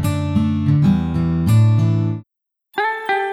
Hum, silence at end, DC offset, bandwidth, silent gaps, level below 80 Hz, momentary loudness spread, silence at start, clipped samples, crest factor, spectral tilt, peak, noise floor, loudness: none; 0 s; under 0.1%; 14 kHz; none; -38 dBFS; 9 LU; 0 s; under 0.1%; 12 dB; -8 dB/octave; -6 dBFS; -76 dBFS; -17 LUFS